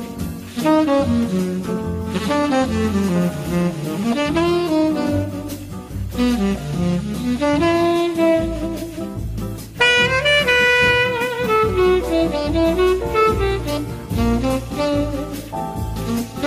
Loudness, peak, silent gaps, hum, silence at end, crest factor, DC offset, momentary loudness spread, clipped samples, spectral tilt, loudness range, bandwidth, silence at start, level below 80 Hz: -19 LUFS; -4 dBFS; none; none; 0 s; 14 dB; under 0.1%; 13 LU; under 0.1%; -5.5 dB/octave; 5 LU; 15.5 kHz; 0 s; -34 dBFS